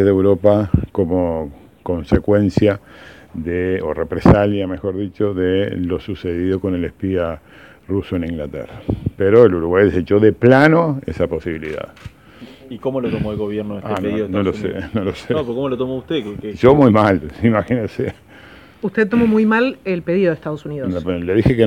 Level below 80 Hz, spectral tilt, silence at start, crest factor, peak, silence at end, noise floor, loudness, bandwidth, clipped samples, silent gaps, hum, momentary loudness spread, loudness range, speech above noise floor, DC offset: -36 dBFS; -8.5 dB/octave; 0 s; 16 dB; 0 dBFS; 0 s; -42 dBFS; -17 LUFS; 12 kHz; 0.1%; none; none; 14 LU; 8 LU; 25 dB; 0.1%